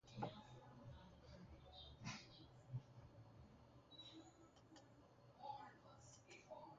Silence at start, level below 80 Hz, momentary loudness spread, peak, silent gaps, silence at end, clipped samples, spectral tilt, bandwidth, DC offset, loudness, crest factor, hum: 0.05 s; -74 dBFS; 12 LU; -36 dBFS; none; 0 s; under 0.1%; -4.5 dB/octave; 7.4 kHz; under 0.1%; -60 LUFS; 24 dB; none